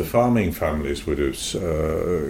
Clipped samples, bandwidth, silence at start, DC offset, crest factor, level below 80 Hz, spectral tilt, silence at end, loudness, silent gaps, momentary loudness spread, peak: under 0.1%; 16.5 kHz; 0 s; under 0.1%; 16 dB; -36 dBFS; -5.5 dB/octave; 0 s; -23 LUFS; none; 7 LU; -6 dBFS